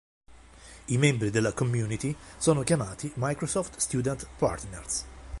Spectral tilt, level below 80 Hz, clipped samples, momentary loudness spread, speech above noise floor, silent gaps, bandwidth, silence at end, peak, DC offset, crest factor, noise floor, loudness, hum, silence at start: -5 dB/octave; -48 dBFS; under 0.1%; 9 LU; 22 dB; none; 11.5 kHz; 0 s; -10 dBFS; under 0.1%; 20 dB; -50 dBFS; -29 LUFS; none; 0.3 s